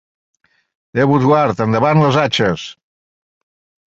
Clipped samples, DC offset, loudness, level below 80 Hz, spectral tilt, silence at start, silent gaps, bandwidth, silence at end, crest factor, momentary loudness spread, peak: under 0.1%; under 0.1%; -14 LUFS; -50 dBFS; -6.5 dB/octave; 0.95 s; none; 7.8 kHz; 1.15 s; 16 dB; 11 LU; 0 dBFS